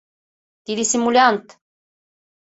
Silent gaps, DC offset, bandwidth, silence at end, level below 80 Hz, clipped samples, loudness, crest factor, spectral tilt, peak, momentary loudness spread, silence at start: none; under 0.1%; 8.2 kHz; 1 s; -66 dBFS; under 0.1%; -18 LUFS; 20 dB; -2 dB/octave; -2 dBFS; 13 LU; 0.7 s